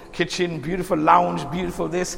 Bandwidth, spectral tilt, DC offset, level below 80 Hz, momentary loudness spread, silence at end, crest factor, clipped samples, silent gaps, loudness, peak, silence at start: 16.5 kHz; -5 dB/octave; under 0.1%; -44 dBFS; 10 LU; 0 s; 20 dB; under 0.1%; none; -22 LUFS; -2 dBFS; 0 s